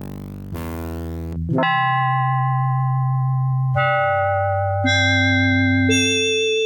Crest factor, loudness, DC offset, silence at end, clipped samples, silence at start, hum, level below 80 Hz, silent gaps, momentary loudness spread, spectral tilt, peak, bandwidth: 12 dB; -18 LUFS; under 0.1%; 0 s; under 0.1%; 0 s; none; -42 dBFS; none; 13 LU; -5 dB/octave; -6 dBFS; 17 kHz